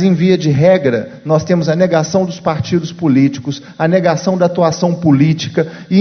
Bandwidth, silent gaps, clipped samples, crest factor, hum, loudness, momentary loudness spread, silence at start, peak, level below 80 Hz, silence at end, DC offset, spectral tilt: 6.6 kHz; none; under 0.1%; 12 dB; none; -13 LUFS; 7 LU; 0 s; 0 dBFS; -48 dBFS; 0 s; under 0.1%; -7 dB/octave